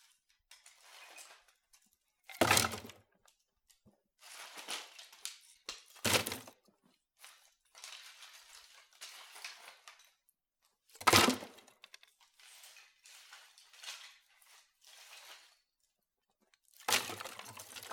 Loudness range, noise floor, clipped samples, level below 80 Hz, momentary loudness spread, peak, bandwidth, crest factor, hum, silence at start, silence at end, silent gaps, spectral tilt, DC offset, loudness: 19 LU; -85 dBFS; under 0.1%; -74 dBFS; 29 LU; -6 dBFS; 19.5 kHz; 34 dB; none; 0.95 s; 0 s; none; -2 dB/octave; under 0.1%; -34 LUFS